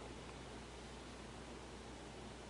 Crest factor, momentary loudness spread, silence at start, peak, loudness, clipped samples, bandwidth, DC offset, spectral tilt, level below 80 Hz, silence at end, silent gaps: 14 dB; 1 LU; 0 s; -38 dBFS; -53 LUFS; under 0.1%; 11 kHz; under 0.1%; -4.5 dB/octave; -60 dBFS; 0 s; none